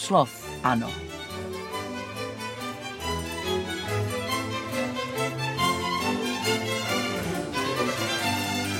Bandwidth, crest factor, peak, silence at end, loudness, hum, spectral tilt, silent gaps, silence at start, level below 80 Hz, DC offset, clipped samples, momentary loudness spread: 16.5 kHz; 22 dB; -6 dBFS; 0 s; -28 LUFS; none; -4 dB/octave; none; 0 s; -52 dBFS; under 0.1%; under 0.1%; 9 LU